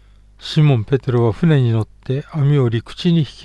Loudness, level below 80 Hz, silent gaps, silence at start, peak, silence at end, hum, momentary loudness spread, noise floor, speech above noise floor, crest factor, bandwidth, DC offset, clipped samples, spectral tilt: -17 LUFS; -44 dBFS; none; 0.4 s; -2 dBFS; 0 s; none; 8 LU; -37 dBFS; 21 dB; 14 dB; 9 kHz; under 0.1%; under 0.1%; -8.5 dB/octave